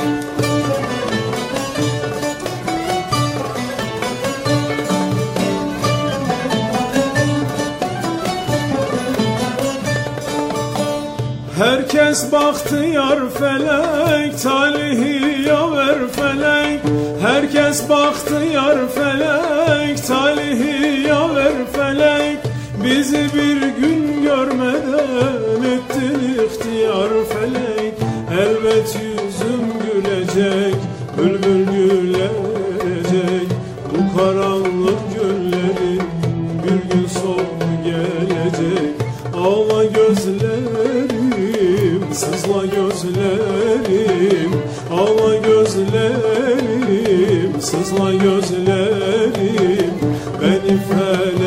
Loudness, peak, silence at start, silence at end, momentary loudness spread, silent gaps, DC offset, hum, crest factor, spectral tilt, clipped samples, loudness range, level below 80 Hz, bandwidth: -17 LUFS; -2 dBFS; 0 s; 0 s; 6 LU; none; under 0.1%; none; 14 dB; -5.5 dB/octave; under 0.1%; 4 LU; -46 dBFS; 16 kHz